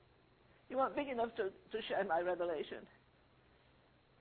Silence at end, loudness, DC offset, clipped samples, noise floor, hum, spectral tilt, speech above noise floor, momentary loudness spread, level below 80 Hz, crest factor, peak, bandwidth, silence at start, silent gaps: 1.35 s; -39 LUFS; under 0.1%; under 0.1%; -69 dBFS; none; -2.5 dB/octave; 30 dB; 8 LU; -74 dBFS; 20 dB; -22 dBFS; 4.5 kHz; 0.7 s; none